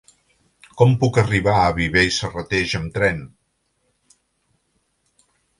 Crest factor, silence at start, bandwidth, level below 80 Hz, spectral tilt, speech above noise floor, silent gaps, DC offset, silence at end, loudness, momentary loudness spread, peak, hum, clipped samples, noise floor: 20 dB; 0.75 s; 11.5 kHz; -42 dBFS; -5.5 dB/octave; 51 dB; none; under 0.1%; 2.3 s; -18 LUFS; 7 LU; 0 dBFS; none; under 0.1%; -69 dBFS